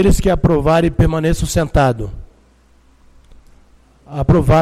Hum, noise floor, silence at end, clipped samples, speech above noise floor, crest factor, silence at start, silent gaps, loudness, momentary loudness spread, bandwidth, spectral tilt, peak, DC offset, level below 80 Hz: none; -50 dBFS; 0 s; under 0.1%; 37 dB; 12 dB; 0 s; none; -15 LUFS; 10 LU; 15 kHz; -6.5 dB/octave; -4 dBFS; under 0.1%; -24 dBFS